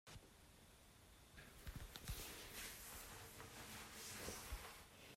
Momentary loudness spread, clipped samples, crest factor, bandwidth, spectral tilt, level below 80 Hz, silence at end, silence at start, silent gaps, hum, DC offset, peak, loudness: 15 LU; under 0.1%; 22 dB; 16 kHz; -2.5 dB/octave; -62 dBFS; 0 s; 0.05 s; none; none; under 0.1%; -34 dBFS; -54 LUFS